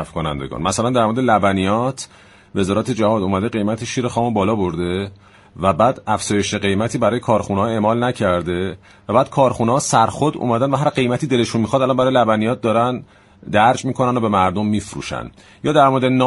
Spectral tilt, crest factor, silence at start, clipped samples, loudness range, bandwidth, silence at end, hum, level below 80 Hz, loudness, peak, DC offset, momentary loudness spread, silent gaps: -5.5 dB/octave; 18 dB; 0 s; under 0.1%; 3 LU; 11.5 kHz; 0 s; none; -46 dBFS; -18 LUFS; 0 dBFS; under 0.1%; 9 LU; none